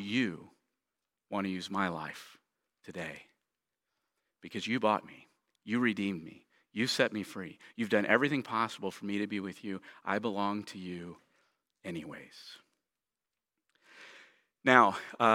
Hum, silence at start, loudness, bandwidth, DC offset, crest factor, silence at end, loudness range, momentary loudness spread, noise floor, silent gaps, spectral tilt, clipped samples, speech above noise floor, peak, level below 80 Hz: none; 0 s; -32 LUFS; 16.5 kHz; under 0.1%; 30 dB; 0 s; 10 LU; 22 LU; under -90 dBFS; none; -5 dB/octave; under 0.1%; over 58 dB; -6 dBFS; -78 dBFS